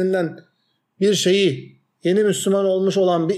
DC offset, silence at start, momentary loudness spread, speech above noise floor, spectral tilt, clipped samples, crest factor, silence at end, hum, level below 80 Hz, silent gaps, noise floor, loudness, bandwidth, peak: under 0.1%; 0 s; 9 LU; 50 dB; -5 dB/octave; under 0.1%; 12 dB; 0 s; none; -74 dBFS; none; -68 dBFS; -19 LUFS; 14 kHz; -6 dBFS